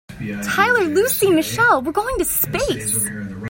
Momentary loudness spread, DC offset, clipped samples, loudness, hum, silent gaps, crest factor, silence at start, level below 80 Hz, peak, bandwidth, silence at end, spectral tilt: 6 LU; under 0.1%; under 0.1%; -18 LUFS; none; none; 16 dB; 0.1 s; -42 dBFS; -2 dBFS; 16.5 kHz; 0 s; -3.5 dB/octave